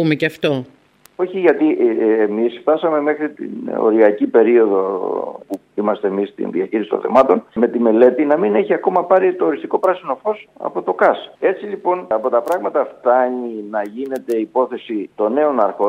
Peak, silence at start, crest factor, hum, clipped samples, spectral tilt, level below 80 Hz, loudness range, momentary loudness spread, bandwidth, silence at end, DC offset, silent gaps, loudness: 0 dBFS; 0 s; 16 dB; none; under 0.1%; -7.5 dB/octave; -64 dBFS; 4 LU; 11 LU; 13 kHz; 0 s; under 0.1%; none; -17 LUFS